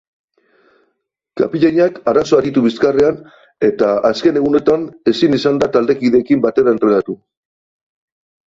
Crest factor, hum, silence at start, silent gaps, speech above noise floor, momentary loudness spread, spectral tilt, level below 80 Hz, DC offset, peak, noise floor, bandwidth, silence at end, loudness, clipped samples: 14 dB; none; 1.35 s; none; 56 dB; 5 LU; -6.5 dB/octave; -52 dBFS; under 0.1%; -2 dBFS; -69 dBFS; 7.8 kHz; 1.4 s; -14 LUFS; under 0.1%